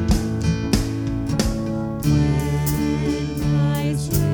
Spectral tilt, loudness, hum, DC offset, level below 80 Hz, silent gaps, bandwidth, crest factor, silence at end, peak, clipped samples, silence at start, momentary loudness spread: -6.5 dB/octave; -21 LUFS; none; under 0.1%; -30 dBFS; none; over 20 kHz; 16 dB; 0 s; -4 dBFS; under 0.1%; 0 s; 4 LU